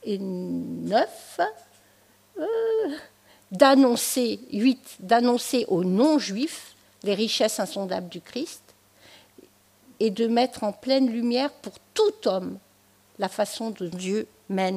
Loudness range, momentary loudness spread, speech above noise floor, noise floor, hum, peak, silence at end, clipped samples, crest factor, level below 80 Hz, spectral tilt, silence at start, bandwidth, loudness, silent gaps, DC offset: 7 LU; 13 LU; 36 dB; -60 dBFS; none; -2 dBFS; 0 s; under 0.1%; 22 dB; -72 dBFS; -4.5 dB/octave; 0.05 s; 15.5 kHz; -25 LUFS; none; under 0.1%